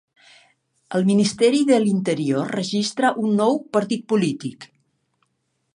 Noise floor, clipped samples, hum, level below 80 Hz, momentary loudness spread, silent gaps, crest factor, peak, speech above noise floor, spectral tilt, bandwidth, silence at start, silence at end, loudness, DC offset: -72 dBFS; under 0.1%; none; -68 dBFS; 7 LU; none; 16 dB; -6 dBFS; 52 dB; -5.5 dB/octave; 11 kHz; 0.9 s; 1.1 s; -20 LUFS; under 0.1%